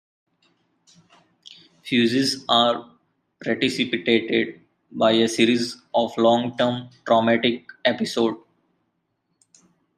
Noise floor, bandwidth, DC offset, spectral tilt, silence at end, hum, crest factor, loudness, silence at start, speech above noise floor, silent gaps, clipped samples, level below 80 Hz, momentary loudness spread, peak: -73 dBFS; 14 kHz; under 0.1%; -4.5 dB/octave; 1.6 s; none; 20 dB; -21 LUFS; 1.5 s; 53 dB; none; under 0.1%; -68 dBFS; 11 LU; -4 dBFS